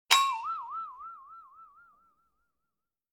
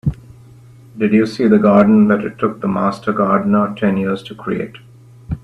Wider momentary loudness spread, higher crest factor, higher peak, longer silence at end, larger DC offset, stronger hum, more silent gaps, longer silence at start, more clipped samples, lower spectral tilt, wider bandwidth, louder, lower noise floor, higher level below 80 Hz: first, 26 LU vs 13 LU; first, 30 dB vs 16 dB; second, -6 dBFS vs 0 dBFS; first, 1.5 s vs 0.05 s; neither; neither; neither; about the same, 0.1 s vs 0.05 s; neither; second, 3.5 dB/octave vs -8.5 dB/octave; first, 19.5 kHz vs 6.4 kHz; second, -30 LUFS vs -15 LUFS; first, -88 dBFS vs -41 dBFS; second, -80 dBFS vs -42 dBFS